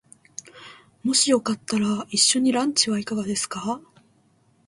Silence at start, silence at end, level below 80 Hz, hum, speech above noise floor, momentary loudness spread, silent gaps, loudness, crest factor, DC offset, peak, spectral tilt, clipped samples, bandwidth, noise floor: 0.55 s; 0.85 s; -66 dBFS; none; 39 dB; 19 LU; none; -22 LUFS; 20 dB; under 0.1%; -6 dBFS; -2.5 dB/octave; under 0.1%; 11.5 kHz; -62 dBFS